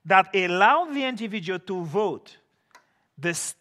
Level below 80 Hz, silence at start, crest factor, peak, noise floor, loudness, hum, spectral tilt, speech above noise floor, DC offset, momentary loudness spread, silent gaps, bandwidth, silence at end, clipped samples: -80 dBFS; 0.05 s; 22 dB; -2 dBFS; -59 dBFS; -24 LUFS; none; -3.5 dB/octave; 36 dB; under 0.1%; 11 LU; none; 14 kHz; 0.1 s; under 0.1%